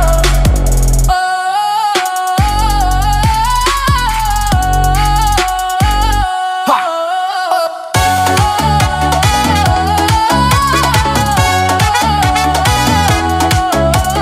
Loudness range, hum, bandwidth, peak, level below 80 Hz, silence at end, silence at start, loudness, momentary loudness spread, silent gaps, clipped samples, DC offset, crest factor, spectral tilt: 2 LU; none; 16 kHz; 0 dBFS; -18 dBFS; 0 s; 0 s; -12 LUFS; 3 LU; none; under 0.1%; under 0.1%; 12 dB; -4 dB/octave